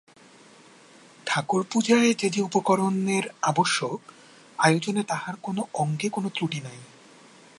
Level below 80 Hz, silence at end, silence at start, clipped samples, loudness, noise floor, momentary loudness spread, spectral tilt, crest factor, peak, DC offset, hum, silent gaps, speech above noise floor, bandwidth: -74 dBFS; 0.75 s; 1.25 s; under 0.1%; -25 LUFS; -52 dBFS; 12 LU; -4.5 dB/octave; 20 dB; -6 dBFS; under 0.1%; none; none; 28 dB; 11.5 kHz